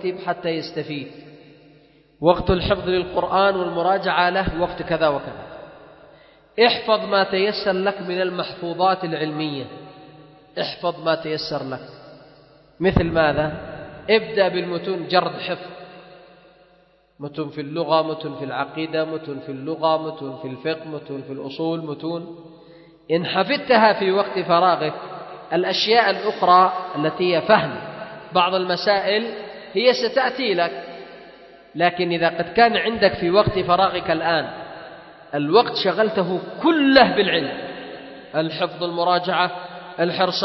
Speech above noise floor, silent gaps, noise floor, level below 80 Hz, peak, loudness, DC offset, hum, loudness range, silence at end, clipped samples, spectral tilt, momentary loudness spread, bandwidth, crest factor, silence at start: 37 dB; none; -57 dBFS; -46 dBFS; 0 dBFS; -20 LUFS; under 0.1%; none; 8 LU; 0 s; under 0.1%; -6.5 dB/octave; 17 LU; 6 kHz; 22 dB; 0 s